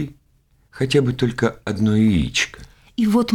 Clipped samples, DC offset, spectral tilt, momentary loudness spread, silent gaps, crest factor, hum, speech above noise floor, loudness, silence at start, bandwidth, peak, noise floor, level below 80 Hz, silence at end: under 0.1%; under 0.1%; -5.5 dB/octave; 9 LU; none; 14 dB; none; 41 dB; -20 LUFS; 0 s; 14.5 kHz; -6 dBFS; -59 dBFS; -40 dBFS; 0 s